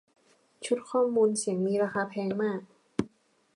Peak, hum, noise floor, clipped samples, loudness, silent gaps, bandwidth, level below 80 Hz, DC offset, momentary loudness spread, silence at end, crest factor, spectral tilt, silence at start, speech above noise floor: -12 dBFS; none; -61 dBFS; under 0.1%; -29 LUFS; none; 11.5 kHz; -68 dBFS; under 0.1%; 12 LU; 0.5 s; 18 dB; -5 dB/octave; 0.6 s; 34 dB